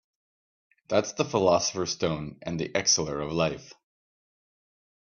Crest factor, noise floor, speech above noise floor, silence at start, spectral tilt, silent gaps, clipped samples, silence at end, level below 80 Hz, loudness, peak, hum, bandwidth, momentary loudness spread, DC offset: 22 dB; under -90 dBFS; over 63 dB; 0.9 s; -3.5 dB/octave; none; under 0.1%; 1.3 s; -58 dBFS; -27 LUFS; -8 dBFS; none; 7.2 kHz; 10 LU; under 0.1%